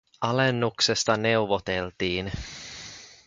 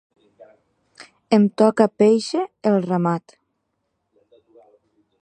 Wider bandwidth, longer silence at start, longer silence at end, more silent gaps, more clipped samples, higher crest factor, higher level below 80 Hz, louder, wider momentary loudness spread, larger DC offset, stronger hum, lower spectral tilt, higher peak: about the same, 9.6 kHz vs 9.4 kHz; second, 0.2 s vs 1 s; second, 0.15 s vs 2 s; neither; neither; about the same, 20 dB vs 20 dB; first, -50 dBFS vs -72 dBFS; second, -25 LUFS vs -19 LUFS; first, 15 LU vs 8 LU; neither; neither; second, -4 dB/octave vs -7 dB/octave; second, -6 dBFS vs -2 dBFS